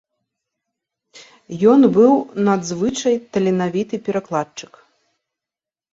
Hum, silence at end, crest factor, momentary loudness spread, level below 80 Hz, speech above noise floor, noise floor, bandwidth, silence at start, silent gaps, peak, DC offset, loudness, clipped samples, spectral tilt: none; 1.3 s; 18 dB; 12 LU; -60 dBFS; 72 dB; -89 dBFS; 7.8 kHz; 1.15 s; none; -2 dBFS; under 0.1%; -17 LUFS; under 0.1%; -6 dB/octave